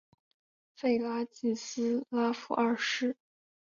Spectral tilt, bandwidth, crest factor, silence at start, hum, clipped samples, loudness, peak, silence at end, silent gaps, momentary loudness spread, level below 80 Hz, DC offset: -3.5 dB/octave; 7.4 kHz; 16 dB; 0.8 s; none; under 0.1%; -32 LUFS; -16 dBFS; 0.5 s; none; 5 LU; -78 dBFS; under 0.1%